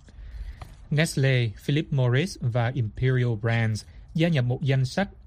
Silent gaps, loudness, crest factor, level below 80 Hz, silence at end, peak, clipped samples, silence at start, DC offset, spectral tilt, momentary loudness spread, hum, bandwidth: none; -25 LUFS; 16 dB; -46 dBFS; 0.05 s; -8 dBFS; under 0.1%; 0.05 s; under 0.1%; -6.5 dB/octave; 18 LU; none; 12.5 kHz